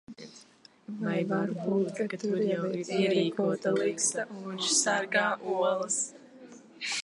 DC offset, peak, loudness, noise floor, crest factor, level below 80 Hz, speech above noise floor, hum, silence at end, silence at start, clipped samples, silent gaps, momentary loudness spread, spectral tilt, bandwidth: under 0.1%; -12 dBFS; -29 LUFS; -58 dBFS; 18 dB; -80 dBFS; 29 dB; none; 0 s; 0.1 s; under 0.1%; none; 10 LU; -3.5 dB/octave; 11.5 kHz